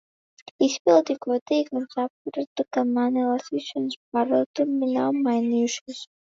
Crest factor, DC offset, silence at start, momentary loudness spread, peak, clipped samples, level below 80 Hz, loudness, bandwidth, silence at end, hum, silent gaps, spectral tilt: 18 dB; under 0.1%; 0.6 s; 10 LU; -6 dBFS; under 0.1%; -78 dBFS; -24 LUFS; 7.8 kHz; 0.15 s; none; 0.80-0.85 s, 1.41-1.46 s, 2.10-2.25 s, 2.47-2.56 s, 3.96-4.12 s, 4.46-4.54 s, 5.81-5.86 s; -4 dB/octave